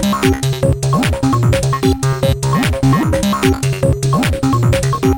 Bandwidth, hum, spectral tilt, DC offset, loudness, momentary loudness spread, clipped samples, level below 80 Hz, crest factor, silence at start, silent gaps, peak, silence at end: 17 kHz; none; -6 dB/octave; under 0.1%; -14 LUFS; 2 LU; under 0.1%; -26 dBFS; 14 dB; 0 s; none; 0 dBFS; 0 s